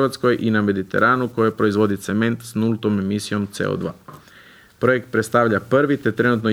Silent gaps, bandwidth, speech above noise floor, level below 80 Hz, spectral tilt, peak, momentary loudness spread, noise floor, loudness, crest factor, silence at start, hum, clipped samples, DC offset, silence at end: none; 16 kHz; 28 dB; -58 dBFS; -6.5 dB/octave; -2 dBFS; 6 LU; -47 dBFS; -20 LUFS; 16 dB; 0 s; none; under 0.1%; under 0.1%; 0 s